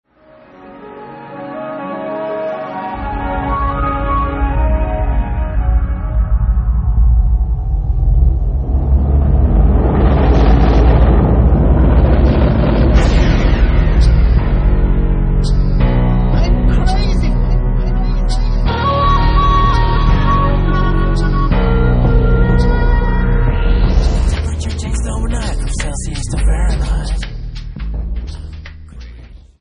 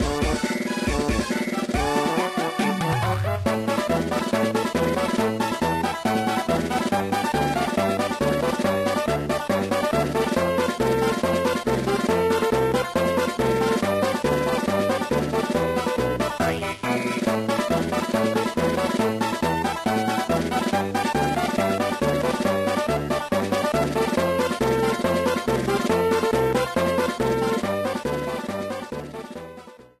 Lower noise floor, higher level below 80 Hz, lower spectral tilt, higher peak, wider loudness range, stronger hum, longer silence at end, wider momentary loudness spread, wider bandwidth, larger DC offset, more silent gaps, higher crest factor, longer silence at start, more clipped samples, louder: about the same, -44 dBFS vs -44 dBFS; first, -14 dBFS vs -42 dBFS; first, -7 dB/octave vs -5 dB/octave; first, 0 dBFS vs -8 dBFS; first, 8 LU vs 2 LU; neither; about the same, 0.25 s vs 0.2 s; first, 12 LU vs 3 LU; second, 10.5 kHz vs 15.5 kHz; neither; neither; about the same, 12 dB vs 16 dB; first, 0.6 s vs 0 s; neither; first, -15 LUFS vs -23 LUFS